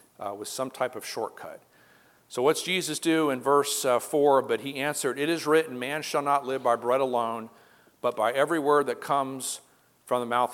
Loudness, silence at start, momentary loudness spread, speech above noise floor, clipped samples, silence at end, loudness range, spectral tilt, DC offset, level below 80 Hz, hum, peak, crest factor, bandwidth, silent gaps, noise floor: -26 LUFS; 0.2 s; 11 LU; 33 dB; under 0.1%; 0 s; 3 LU; -3.5 dB/octave; under 0.1%; -82 dBFS; none; -8 dBFS; 18 dB; 17 kHz; none; -59 dBFS